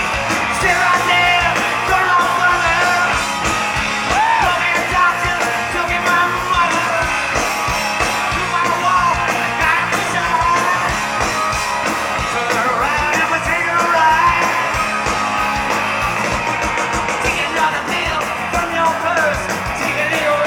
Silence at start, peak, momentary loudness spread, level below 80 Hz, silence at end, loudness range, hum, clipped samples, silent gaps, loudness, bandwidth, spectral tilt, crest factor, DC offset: 0 s; -2 dBFS; 5 LU; -36 dBFS; 0 s; 3 LU; none; under 0.1%; none; -15 LUFS; 19 kHz; -3 dB/octave; 14 dB; under 0.1%